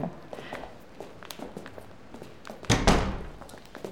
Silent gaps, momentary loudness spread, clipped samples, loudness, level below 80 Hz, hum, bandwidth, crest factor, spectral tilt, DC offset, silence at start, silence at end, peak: none; 22 LU; under 0.1%; -29 LUFS; -38 dBFS; none; 17.5 kHz; 24 dB; -4.5 dB/octave; 0.4%; 0 s; 0 s; -6 dBFS